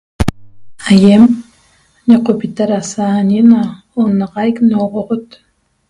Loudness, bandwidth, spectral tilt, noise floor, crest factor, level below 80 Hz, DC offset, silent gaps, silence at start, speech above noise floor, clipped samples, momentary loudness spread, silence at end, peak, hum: -12 LUFS; 11.5 kHz; -7 dB/octave; -51 dBFS; 12 dB; -34 dBFS; under 0.1%; none; 0.2 s; 41 dB; 1%; 12 LU; 0.65 s; 0 dBFS; none